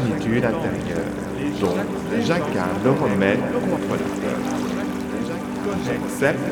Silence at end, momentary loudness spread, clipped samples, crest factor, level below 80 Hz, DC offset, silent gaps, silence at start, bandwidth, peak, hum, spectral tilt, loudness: 0 s; 7 LU; under 0.1%; 18 dB; -46 dBFS; under 0.1%; none; 0 s; 19.5 kHz; -4 dBFS; none; -6.5 dB/octave; -23 LUFS